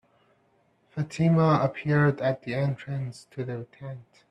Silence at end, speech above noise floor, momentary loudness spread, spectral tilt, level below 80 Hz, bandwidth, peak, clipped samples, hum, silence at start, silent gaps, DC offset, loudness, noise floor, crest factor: 0.3 s; 40 dB; 19 LU; -8 dB/octave; -62 dBFS; 9.8 kHz; -10 dBFS; under 0.1%; none; 0.95 s; none; under 0.1%; -26 LUFS; -66 dBFS; 16 dB